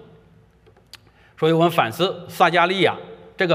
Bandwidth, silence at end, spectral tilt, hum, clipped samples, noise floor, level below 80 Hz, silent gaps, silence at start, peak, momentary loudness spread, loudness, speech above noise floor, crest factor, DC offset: 16 kHz; 0 s; -5.5 dB/octave; none; under 0.1%; -54 dBFS; -62 dBFS; none; 1.4 s; -2 dBFS; 8 LU; -19 LUFS; 35 dB; 20 dB; under 0.1%